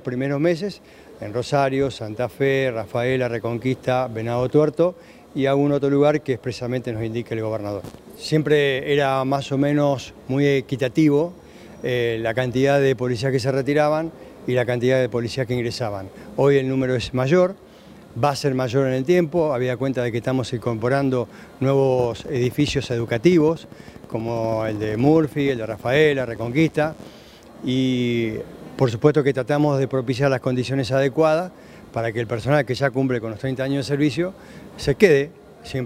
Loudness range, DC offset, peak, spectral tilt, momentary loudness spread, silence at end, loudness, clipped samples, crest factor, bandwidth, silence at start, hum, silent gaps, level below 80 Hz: 2 LU; under 0.1%; 0 dBFS; -7 dB/octave; 11 LU; 0 s; -21 LUFS; under 0.1%; 20 dB; 15.5 kHz; 0.05 s; none; none; -52 dBFS